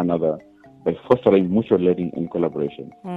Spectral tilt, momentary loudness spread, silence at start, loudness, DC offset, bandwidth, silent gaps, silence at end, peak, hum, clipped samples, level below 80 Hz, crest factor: -10 dB/octave; 12 LU; 0 s; -21 LUFS; under 0.1%; 4.9 kHz; none; 0 s; -2 dBFS; none; under 0.1%; -56 dBFS; 18 dB